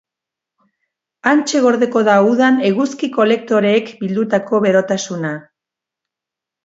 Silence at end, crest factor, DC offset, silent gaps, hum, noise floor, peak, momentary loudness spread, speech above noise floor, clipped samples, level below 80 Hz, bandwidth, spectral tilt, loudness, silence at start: 1.25 s; 16 dB; under 0.1%; none; none; -85 dBFS; 0 dBFS; 9 LU; 71 dB; under 0.1%; -66 dBFS; 8 kHz; -5 dB/octave; -15 LUFS; 1.25 s